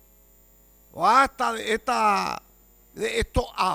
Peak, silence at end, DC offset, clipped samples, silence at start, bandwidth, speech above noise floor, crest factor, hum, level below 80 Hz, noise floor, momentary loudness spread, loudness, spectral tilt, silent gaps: -6 dBFS; 0 s; under 0.1%; under 0.1%; 0.95 s; 19 kHz; 33 dB; 18 dB; 60 Hz at -60 dBFS; -42 dBFS; -56 dBFS; 12 LU; -23 LUFS; -4 dB/octave; none